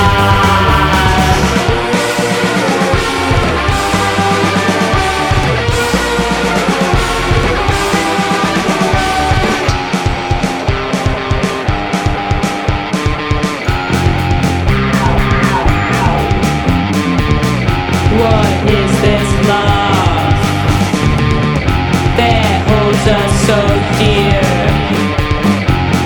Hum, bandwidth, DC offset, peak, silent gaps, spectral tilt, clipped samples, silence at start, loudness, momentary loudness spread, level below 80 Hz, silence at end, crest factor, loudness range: none; 19 kHz; under 0.1%; 0 dBFS; none; -5.5 dB/octave; under 0.1%; 0 s; -12 LUFS; 5 LU; -22 dBFS; 0 s; 12 dB; 3 LU